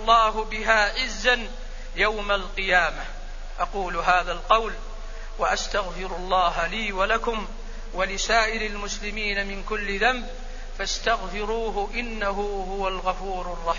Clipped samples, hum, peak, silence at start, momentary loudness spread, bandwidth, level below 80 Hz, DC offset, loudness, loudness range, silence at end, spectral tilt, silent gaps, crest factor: under 0.1%; none; -4 dBFS; 0 s; 16 LU; 7.4 kHz; -34 dBFS; under 0.1%; -24 LUFS; 3 LU; 0 s; -2.5 dB/octave; none; 22 dB